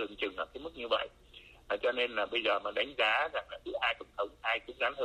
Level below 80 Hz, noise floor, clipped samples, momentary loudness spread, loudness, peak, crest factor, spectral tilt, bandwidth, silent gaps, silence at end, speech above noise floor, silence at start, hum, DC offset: -64 dBFS; -57 dBFS; under 0.1%; 11 LU; -33 LUFS; -16 dBFS; 18 dB; -3.5 dB/octave; 12 kHz; none; 0 s; 23 dB; 0 s; none; under 0.1%